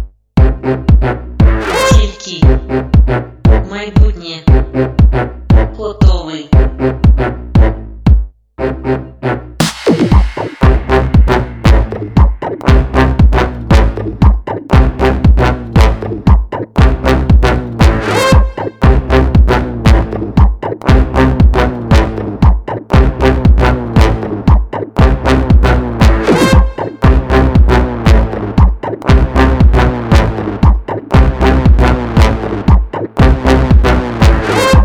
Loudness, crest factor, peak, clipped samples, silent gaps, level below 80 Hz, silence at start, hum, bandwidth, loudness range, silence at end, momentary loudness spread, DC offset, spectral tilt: -11 LUFS; 10 dB; 0 dBFS; 0.9%; none; -12 dBFS; 0 s; none; 11.5 kHz; 2 LU; 0 s; 6 LU; under 0.1%; -7 dB/octave